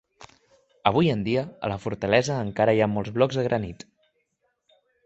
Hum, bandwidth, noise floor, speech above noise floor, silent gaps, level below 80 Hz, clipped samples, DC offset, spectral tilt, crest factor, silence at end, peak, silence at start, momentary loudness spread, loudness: none; 8.2 kHz; -74 dBFS; 50 dB; none; -54 dBFS; under 0.1%; under 0.1%; -6.5 dB/octave; 22 dB; 1.3 s; -4 dBFS; 0.2 s; 9 LU; -24 LUFS